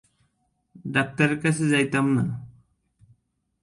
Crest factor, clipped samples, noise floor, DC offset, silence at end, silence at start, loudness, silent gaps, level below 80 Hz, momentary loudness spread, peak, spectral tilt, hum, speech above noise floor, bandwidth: 20 dB; under 0.1%; -71 dBFS; under 0.1%; 1.15 s; 0.85 s; -23 LUFS; none; -60 dBFS; 10 LU; -6 dBFS; -5.5 dB/octave; none; 49 dB; 11.5 kHz